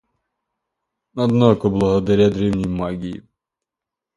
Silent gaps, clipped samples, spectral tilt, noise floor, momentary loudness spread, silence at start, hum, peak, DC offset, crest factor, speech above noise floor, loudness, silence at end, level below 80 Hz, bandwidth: none; under 0.1%; -8 dB/octave; -86 dBFS; 15 LU; 1.15 s; none; 0 dBFS; under 0.1%; 20 dB; 69 dB; -18 LUFS; 1 s; -42 dBFS; 11 kHz